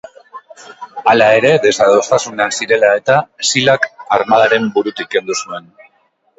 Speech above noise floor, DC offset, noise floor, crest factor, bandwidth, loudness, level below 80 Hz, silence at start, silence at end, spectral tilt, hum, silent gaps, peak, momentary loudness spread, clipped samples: 46 dB; under 0.1%; -58 dBFS; 14 dB; 8.2 kHz; -13 LUFS; -58 dBFS; 0.35 s; 0.8 s; -3 dB/octave; none; none; 0 dBFS; 11 LU; under 0.1%